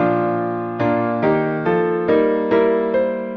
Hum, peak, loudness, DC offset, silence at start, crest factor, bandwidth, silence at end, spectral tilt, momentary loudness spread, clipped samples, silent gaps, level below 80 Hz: none; -4 dBFS; -18 LUFS; under 0.1%; 0 s; 14 dB; 5.6 kHz; 0 s; -9.5 dB/octave; 4 LU; under 0.1%; none; -54 dBFS